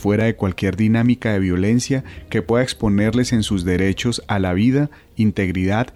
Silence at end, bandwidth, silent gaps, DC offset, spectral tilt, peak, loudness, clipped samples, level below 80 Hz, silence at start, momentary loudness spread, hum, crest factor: 0.05 s; 13 kHz; none; under 0.1%; -6 dB/octave; -6 dBFS; -19 LUFS; under 0.1%; -40 dBFS; 0 s; 5 LU; none; 12 dB